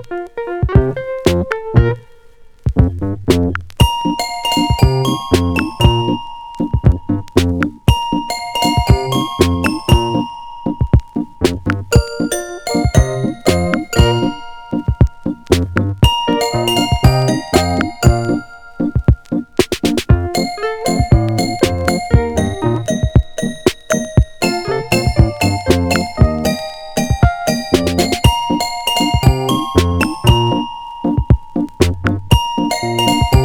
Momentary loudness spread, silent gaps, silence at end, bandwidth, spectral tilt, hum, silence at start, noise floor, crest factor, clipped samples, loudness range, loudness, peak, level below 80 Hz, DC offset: 7 LU; none; 0 s; 19 kHz; -5.5 dB/octave; none; 0 s; -40 dBFS; 14 dB; under 0.1%; 2 LU; -15 LUFS; 0 dBFS; -22 dBFS; under 0.1%